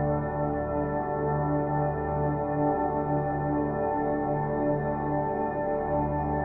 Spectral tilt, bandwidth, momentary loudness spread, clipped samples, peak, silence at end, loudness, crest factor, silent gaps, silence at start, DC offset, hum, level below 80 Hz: -13 dB/octave; 2.6 kHz; 2 LU; under 0.1%; -14 dBFS; 0 s; -28 LUFS; 12 dB; none; 0 s; under 0.1%; none; -44 dBFS